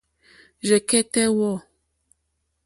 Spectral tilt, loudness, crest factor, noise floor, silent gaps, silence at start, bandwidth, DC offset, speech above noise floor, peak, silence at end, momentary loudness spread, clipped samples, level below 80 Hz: -3.5 dB/octave; -21 LUFS; 18 dB; -74 dBFS; none; 0.65 s; 12 kHz; under 0.1%; 54 dB; -6 dBFS; 1.05 s; 11 LU; under 0.1%; -62 dBFS